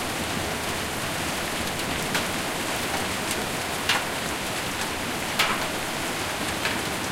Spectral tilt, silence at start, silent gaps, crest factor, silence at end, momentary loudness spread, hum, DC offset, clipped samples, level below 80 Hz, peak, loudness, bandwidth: -2.5 dB/octave; 0 s; none; 20 dB; 0 s; 4 LU; none; under 0.1%; under 0.1%; -48 dBFS; -6 dBFS; -26 LUFS; 16.5 kHz